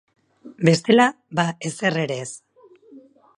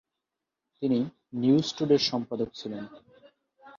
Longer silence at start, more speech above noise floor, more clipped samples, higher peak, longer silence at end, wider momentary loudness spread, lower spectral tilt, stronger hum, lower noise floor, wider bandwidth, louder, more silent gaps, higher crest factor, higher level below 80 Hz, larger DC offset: second, 0.45 s vs 0.8 s; second, 29 dB vs 59 dB; neither; first, -2 dBFS vs -10 dBFS; first, 0.4 s vs 0.1 s; about the same, 14 LU vs 14 LU; about the same, -5 dB/octave vs -6 dB/octave; neither; second, -49 dBFS vs -87 dBFS; first, 11.5 kHz vs 7.4 kHz; first, -20 LUFS vs -27 LUFS; neither; about the same, 20 dB vs 20 dB; about the same, -66 dBFS vs -68 dBFS; neither